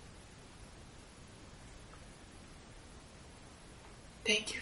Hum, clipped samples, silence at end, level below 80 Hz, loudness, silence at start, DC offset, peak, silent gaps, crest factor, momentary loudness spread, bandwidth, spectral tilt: none; under 0.1%; 0 s; -60 dBFS; -34 LUFS; 0 s; under 0.1%; -16 dBFS; none; 30 dB; 22 LU; 12 kHz; -2 dB/octave